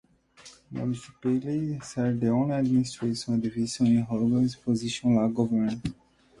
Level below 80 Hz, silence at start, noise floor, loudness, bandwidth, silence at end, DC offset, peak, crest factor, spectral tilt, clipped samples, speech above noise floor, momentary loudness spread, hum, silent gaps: -58 dBFS; 0.45 s; -53 dBFS; -27 LUFS; 11.5 kHz; 0.45 s; under 0.1%; -12 dBFS; 14 dB; -6.5 dB/octave; under 0.1%; 27 dB; 8 LU; none; none